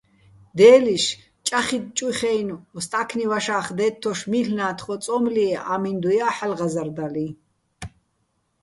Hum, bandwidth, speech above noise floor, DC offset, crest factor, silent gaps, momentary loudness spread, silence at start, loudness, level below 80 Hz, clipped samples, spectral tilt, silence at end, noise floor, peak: none; 11.5 kHz; 49 dB; under 0.1%; 20 dB; none; 15 LU; 0.55 s; -22 LUFS; -58 dBFS; under 0.1%; -4 dB/octave; 0.75 s; -70 dBFS; -2 dBFS